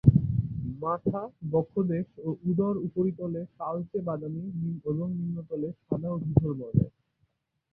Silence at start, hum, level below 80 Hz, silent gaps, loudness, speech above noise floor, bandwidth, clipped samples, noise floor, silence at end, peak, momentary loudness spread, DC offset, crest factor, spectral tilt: 0.05 s; none; -48 dBFS; none; -30 LUFS; 44 dB; 2.6 kHz; under 0.1%; -74 dBFS; 0.85 s; -4 dBFS; 8 LU; under 0.1%; 24 dB; -14 dB/octave